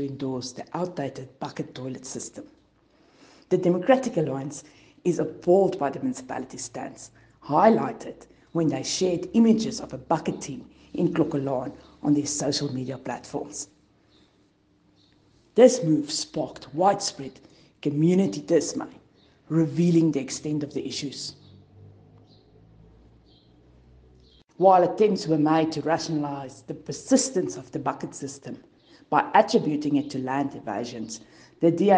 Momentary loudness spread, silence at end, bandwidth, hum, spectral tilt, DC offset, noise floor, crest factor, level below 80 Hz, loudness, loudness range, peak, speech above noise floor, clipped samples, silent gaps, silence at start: 17 LU; 0 s; 10 kHz; none; -5.5 dB/octave; under 0.1%; -63 dBFS; 22 dB; -64 dBFS; -25 LUFS; 7 LU; -4 dBFS; 39 dB; under 0.1%; none; 0 s